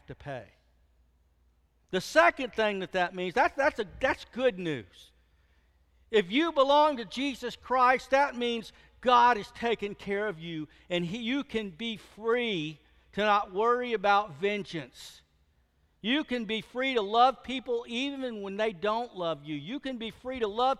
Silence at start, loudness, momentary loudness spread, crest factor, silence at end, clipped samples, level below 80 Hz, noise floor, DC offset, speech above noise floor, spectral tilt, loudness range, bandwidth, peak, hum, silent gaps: 0.1 s; -29 LUFS; 14 LU; 22 dB; 0.05 s; under 0.1%; -62 dBFS; -69 dBFS; under 0.1%; 40 dB; -4.5 dB/octave; 5 LU; 13.5 kHz; -8 dBFS; none; none